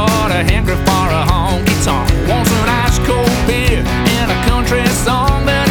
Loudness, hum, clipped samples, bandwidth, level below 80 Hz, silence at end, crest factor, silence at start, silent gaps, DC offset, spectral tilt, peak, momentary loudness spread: -13 LUFS; none; under 0.1%; 20 kHz; -20 dBFS; 0 s; 12 dB; 0 s; none; under 0.1%; -5 dB/octave; 0 dBFS; 1 LU